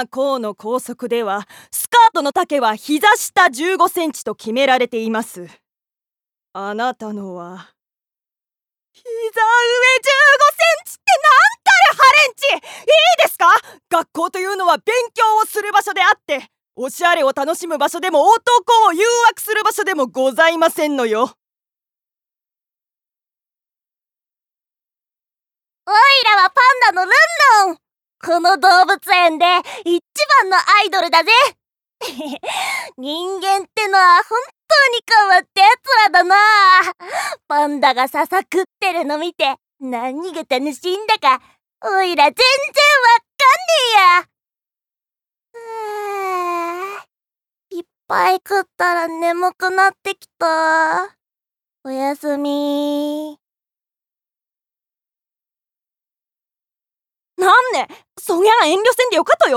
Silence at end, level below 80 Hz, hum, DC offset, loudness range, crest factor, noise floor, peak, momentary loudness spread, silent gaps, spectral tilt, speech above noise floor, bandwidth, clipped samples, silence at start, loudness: 0 s; -70 dBFS; none; under 0.1%; 12 LU; 14 dB; under -90 dBFS; -2 dBFS; 15 LU; none; -1 dB/octave; over 75 dB; 19.5 kHz; under 0.1%; 0 s; -14 LUFS